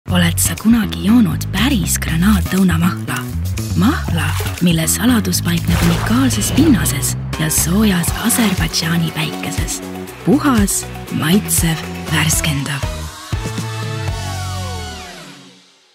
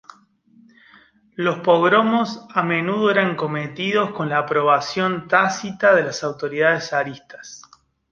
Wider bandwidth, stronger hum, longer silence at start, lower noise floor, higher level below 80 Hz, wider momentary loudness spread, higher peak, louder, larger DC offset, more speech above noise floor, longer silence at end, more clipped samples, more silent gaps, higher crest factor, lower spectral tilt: first, 16.5 kHz vs 7.6 kHz; neither; second, 0.05 s vs 1.4 s; second, -46 dBFS vs -54 dBFS; first, -28 dBFS vs -64 dBFS; about the same, 10 LU vs 9 LU; about the same, 0 dBFS vs -2 dBFS; first, -16 LUFS vs -19 LUFS; neither; second, 31 dB vs 35 dB; about the same, 0.45 s vs 0.55 s; neither; neither; about the same, 16 dB vs 20 dB; about the same, -4.5 dB/octave vs -5 dB/octave